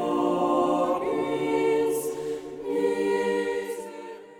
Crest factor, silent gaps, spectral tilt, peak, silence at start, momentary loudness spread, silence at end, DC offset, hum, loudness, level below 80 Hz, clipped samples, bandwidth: 14 dB; none; -5 dB/octave; -12 dBFS; 0 s; 11 LU; 0 s; under 0.1%; none; -26 LUFS; -64 dBFS; under 0.1%; 18 kHz